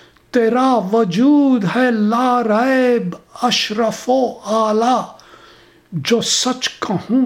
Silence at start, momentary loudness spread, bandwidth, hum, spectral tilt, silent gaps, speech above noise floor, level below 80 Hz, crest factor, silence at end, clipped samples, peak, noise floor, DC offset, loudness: 0.35 s; 8 LU; 15.5 kHz; none; -4 dB/octave; none; 31 dB; -60 dBFS; 14 dB; 0 s; under 0.1%; -2 dBFS; -46 dBFS; under 0.1%; -16 LUFS